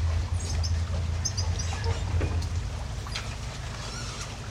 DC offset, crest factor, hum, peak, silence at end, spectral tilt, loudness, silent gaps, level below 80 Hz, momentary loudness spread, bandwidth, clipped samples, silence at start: under 0.1%; 14 dB; none; -16 dBFS; 0 s; -4 dB/octave; -31 LUFS; none; -34 dBFS; 7 LU; 12 kHz; under 0.1%; 0 s